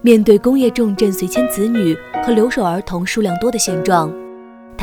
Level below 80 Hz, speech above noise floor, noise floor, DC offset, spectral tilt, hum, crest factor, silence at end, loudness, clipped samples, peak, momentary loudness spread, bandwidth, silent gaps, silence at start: -42 dBFS; 22 dB; -36 dBFS; under 0.1%; -5 dB/octave; none; 14 dB; 0 s; -15 LUFS; 0.1%; 0 dBFS; 8 LU; over 20 kHz; none; 0.05 s